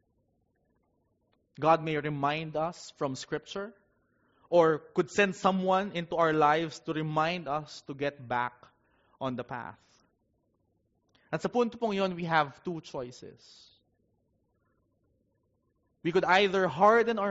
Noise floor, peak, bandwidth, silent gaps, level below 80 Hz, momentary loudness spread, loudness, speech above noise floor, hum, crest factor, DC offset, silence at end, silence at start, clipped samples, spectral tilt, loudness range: -75 dBFS; -10 dBFS; 7.6 kHz; none; -68 dBFS; 15 LU; -29 LUFS; 46 dB; none; 22 dB; under 0.1%; 0 s; 1.6 s; under 0.1%; -4 dB/octave; 10 LU